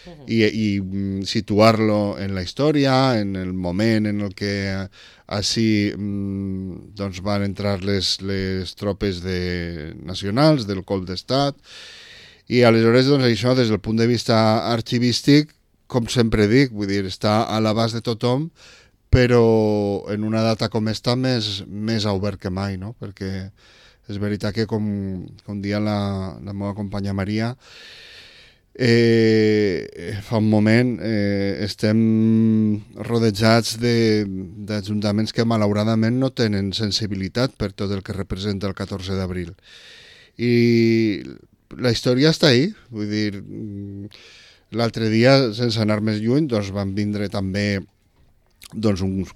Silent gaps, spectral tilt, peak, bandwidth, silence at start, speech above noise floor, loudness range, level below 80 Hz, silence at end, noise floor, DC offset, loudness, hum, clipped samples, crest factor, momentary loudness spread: none; -6 dB/octave; -2 dBFS; 14 kHz; 0.05 s; 37 dB; 7 LU; -44 dBFS; 0.05 s; -57 dBFS; under 0.1%; -20 LUFS; none; under 0.1%; 18 dB; 14 LU